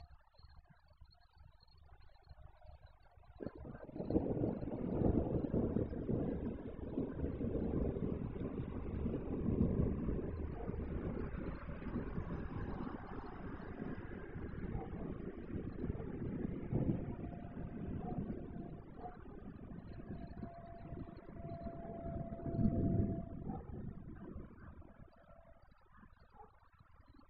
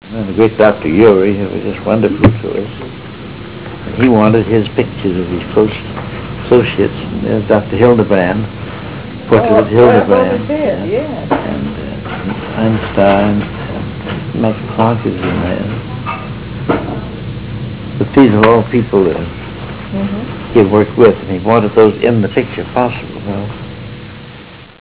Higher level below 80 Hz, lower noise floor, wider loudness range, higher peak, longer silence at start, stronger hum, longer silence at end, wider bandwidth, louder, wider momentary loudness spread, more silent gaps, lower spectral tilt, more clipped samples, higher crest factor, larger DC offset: second, -50 dBFS vs -34 dBFS; first, -66 dBFS vs -33 dBFS; first, 11 LU vs 4 LU; second, -20 dBFS vs 0 dBFS; about the same, 0 s vs 0.05 s; neither; second, 0 s vs 0.15 s; first, 5.2 kHz vs 4 kHz; second, -42 LUFS vs -13 LUFS; about the same, 16 LU vs 16 LU; neither; second, -10 dB/octave vs -11.5 dB/octave; neither; first, 22 dB vs 12 dB; second, 0.1% vs 0.8%